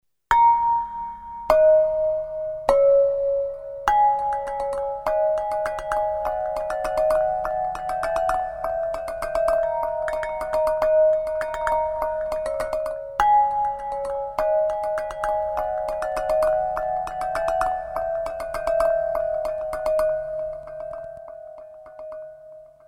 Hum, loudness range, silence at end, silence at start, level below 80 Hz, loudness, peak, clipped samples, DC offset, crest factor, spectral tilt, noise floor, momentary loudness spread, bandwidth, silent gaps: none; 5 LU; 0.2 s; 0.3 s; -46 dBFS; -23 LUFS; 0 dBFS; under 0.1%; under 0.1%; 22 dB; -4 dB/octave; -45 dBFS; 13 LU; 13.5 kHz; none